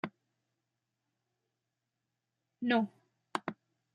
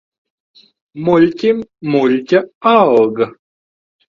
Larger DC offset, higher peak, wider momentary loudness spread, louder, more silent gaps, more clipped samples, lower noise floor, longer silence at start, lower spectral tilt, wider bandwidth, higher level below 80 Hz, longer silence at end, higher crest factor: neither; second, -14 dBFS vs 0 dBFS; first, 13 LU vs 10 LU; second, -36 LUFS vs -14 LUFS; second, none vs 2.55-2.61 s; neither; about the same, -87 dBFS vs under -90 dBFS; second, 0.05 s vs 0.95 s; second, -5.5 dB/octave vs -7.5 dB/octave; first, 10 kHz vs 7.2 kHz; second, -84 dBFS vs -56 dBFS; second, 0.4 s vs 0.85 s; first, 28 dB vs 16 dB